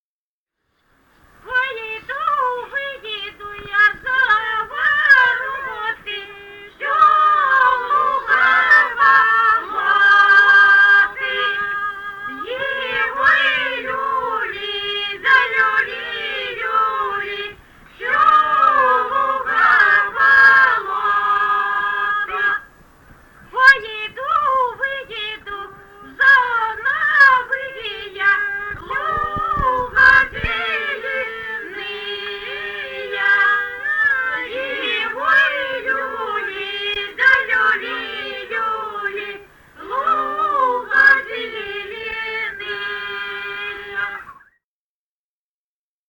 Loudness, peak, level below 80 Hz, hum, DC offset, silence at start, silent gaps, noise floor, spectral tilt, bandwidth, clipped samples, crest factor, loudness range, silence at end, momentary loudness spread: -16 LUFS; -2 dBFS; -48 dBFS; none; under 0.1%; 1.45 s; none; under -90 dBFS; -2.5 dB/octave; 18 kHz; under 0.1%; 16 dB; 8 LU; 1.75 s; 15 LU